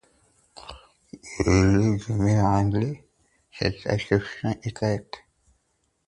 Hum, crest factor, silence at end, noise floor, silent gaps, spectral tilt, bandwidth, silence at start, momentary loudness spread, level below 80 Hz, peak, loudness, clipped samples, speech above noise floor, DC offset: none; 20 dB; 0.9 s; -72 dBFS; none; -6.5 dB/octave; 10.5 kHz; 0.65 s; 23 LU; -40 dBFS; -6 dBFS; -24 LUFS; under 0.1%; 49 dB; under 0.1%